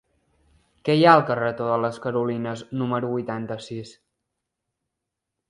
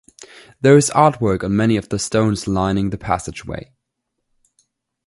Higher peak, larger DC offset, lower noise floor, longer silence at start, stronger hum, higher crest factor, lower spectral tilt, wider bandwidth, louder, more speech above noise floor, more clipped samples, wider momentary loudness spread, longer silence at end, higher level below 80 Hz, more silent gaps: about the same, -2 dBFS vs 0 dBFS; neither; first, -84 dBFS vs -76 dBFS; first, 0.85 s vs 0.65 s; neither; first, 24 dB vs 18 dB; first, -7 dB/octave vs -5.5 dB/octave; about the same, 11 kHz vs 11.5 kHz; second, -23 LUFS vs -17 LUFS; about the same, 61 dB vs 59 dB; neither; about the same, 17 LU vs 15 LU; first, 1.6 s vs 1.45 s; second, -66 dBFS vs -42 dBFS; neither